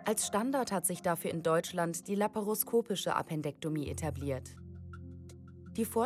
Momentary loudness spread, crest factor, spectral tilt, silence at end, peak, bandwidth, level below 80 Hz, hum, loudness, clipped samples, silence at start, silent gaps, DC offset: 17 LU; 20 dB; -4.5 dB/octave; 0 s; -14 dBFS; 16.5 kHz; -64 dBFS; none; -34 LUFS; under 0.1%; 0 s; none; under 0.1%